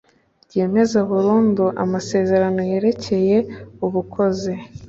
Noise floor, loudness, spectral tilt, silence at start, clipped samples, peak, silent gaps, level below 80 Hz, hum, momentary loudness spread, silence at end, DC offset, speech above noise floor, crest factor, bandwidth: -56 dBFS; -19 LUFS; -7 dB/octave; 0.55 s; under 0.1%; -6 dBFS; none; -52 dBFS; none; 9 LU; 0 s; under 0.1%; 38 dB; 14 dB; 7.8 kHz